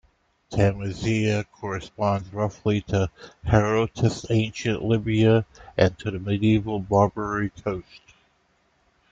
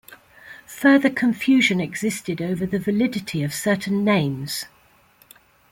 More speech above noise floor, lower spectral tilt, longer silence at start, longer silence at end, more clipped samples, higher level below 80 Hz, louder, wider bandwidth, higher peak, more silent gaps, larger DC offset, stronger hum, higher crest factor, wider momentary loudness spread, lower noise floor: first, 42 dB vs 35 dB; first, -7 dB/octave vs -5 dB/octave; first, 0.5 s vs 0.1 s; about the same, 1.15 s vs 1.05 s; neither; first, -46 dBFS vs -58 dBFS; second, -24 LUFS vs -21 LUFS; second, 7.8 kHz vs 16.5 kHz; about the same, -2 dBFS vs -4 dBFS; neither; neither; neither; about the same, 22 dB vs 18 dB; about the same, 11 LU vs 12 LU; first, -66 dBFS vs -56 dBFS